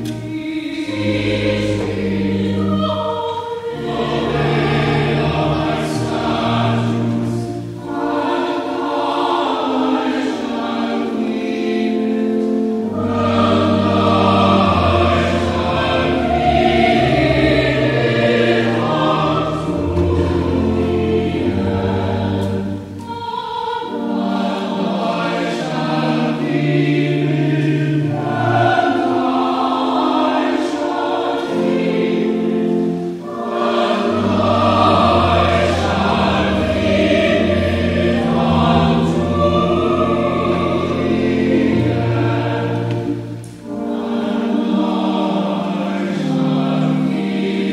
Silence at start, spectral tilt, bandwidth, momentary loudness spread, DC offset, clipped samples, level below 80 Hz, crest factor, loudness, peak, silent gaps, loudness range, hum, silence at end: 0 s; -7 dB/octave; 12 kHz; 7 LU; under 0.1%; under 0.1%; -38 dBFS; 16 dB; -17 LUFS; -2 dBFS; none; 5 LU; none; 0 s